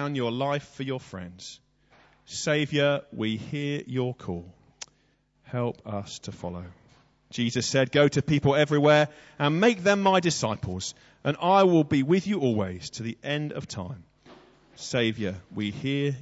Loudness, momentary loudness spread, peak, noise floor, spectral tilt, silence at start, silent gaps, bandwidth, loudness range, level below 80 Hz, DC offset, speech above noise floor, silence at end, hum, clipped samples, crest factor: -26 LUFS; 18 LU; -8 dBFS; -67 dBFS; -5.5 dB/octave; 0 s; none; 8 kHz; 11 LU; -60 dBFS; under 0.1%; 41 dB; 0 s; none; under 0.1%; 20 dB